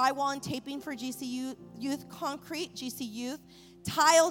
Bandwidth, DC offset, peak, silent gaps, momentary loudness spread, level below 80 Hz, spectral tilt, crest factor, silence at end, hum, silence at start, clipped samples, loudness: 17 kHz; under 0.1%; -10 dBFS; none; 13 LU; -68 dBFS; -3 dB/octave; 22 dB; 0 s; none; 0 s; under 0.1%; -32 LUFS